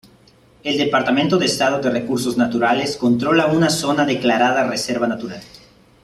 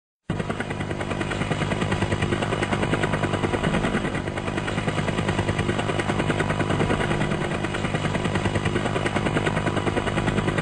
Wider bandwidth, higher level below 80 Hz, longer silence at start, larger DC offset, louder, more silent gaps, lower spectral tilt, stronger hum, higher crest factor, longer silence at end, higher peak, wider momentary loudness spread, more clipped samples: first, 14.5 kHz vs 10.5 kHz; second, -54 dBFS vs -40 dBFS; first, 0.65 s vs 0.3 s; second, under 0.1% vs 0.2%; first, -18 LUFS vs -25 LUFS; neither; second, -4.5 dB/octave vs -6 dB/octave; second, none vs 50 Hz at -40 dBFS; about the same, 16 dB vs 14 dB; first, 0.55 s vs 0 s; first, -2 dBFS vs -10 dBFS; first, 7 LU vs 4 LU; neither